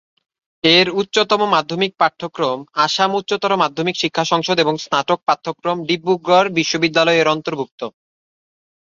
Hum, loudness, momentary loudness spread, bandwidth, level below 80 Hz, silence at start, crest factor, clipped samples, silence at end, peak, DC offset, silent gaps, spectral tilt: none; -17 LUFS; 8 LU; 7.6 kHz; -62 dBFS; 0.65 s; 16 dB; under 0.1%; 0.95 s; -2 dBFS; under 0.1%; 7.71-7.78 s; -4 dB/octave